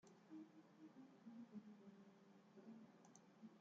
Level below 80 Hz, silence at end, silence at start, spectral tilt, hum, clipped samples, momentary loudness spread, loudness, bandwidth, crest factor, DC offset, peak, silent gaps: under -90 dBFS; 0 s; 0 s; -6.5 dB/octave; none; under 0.1%; 8 LU; -64 LUFS; 7.2 kHz; 16 dB; under 0.1%; -48 dBFS; none